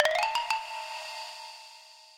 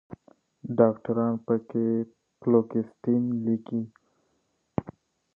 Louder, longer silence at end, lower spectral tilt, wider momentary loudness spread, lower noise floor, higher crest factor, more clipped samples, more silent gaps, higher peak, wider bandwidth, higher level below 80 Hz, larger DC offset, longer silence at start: second, -32 LUFS vs -27 LUFS; second, 0 s vs 0.45 s; second, 1.5 dB/octave vs -11.5 dB/octave; first, 19 LU vs 12 LU; second, -52 dBFS vs -73 dBFS; about the same, 24 dB vs 22 dB; neither; neither; about the same, -8 dBFS vs -6 dBFS; first, 17 kHz vs 3.3 kHz; second, -72 dBFS vs -64 dBFS; neither; about the same, 0 s vs 0.1 s